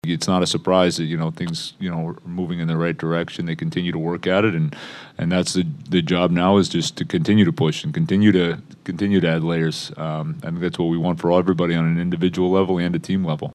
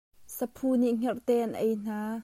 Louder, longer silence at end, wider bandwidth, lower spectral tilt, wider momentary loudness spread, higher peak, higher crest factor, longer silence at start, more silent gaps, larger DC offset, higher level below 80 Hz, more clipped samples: first, -21 LUFS vs -29 LUFS; about the same, 0 s vs 0 s; second, 12 kHz vs 16 kHz; about the same, -6 dB/octave vs -6 dB/octave; about the same, 10 LU vs 10 LU; first, -2 dBFS vs -14 dBFS; about the same, 18 dB vs 14 dB; second, 0.05 s vs 0.2 s; neither; neither; first, -54 dBFS vs -68 dBFS; neither